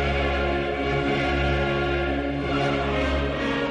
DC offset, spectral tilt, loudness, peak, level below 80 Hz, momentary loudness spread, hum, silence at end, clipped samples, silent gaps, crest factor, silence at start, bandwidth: under 0.1%; -6.5 dB/octave; -24 LUFS; -12 dBFS; -32 dBFS; 2 LU; none; 0 s; under 0.1%; none; 12 dB; 0 s; 9.4 kHz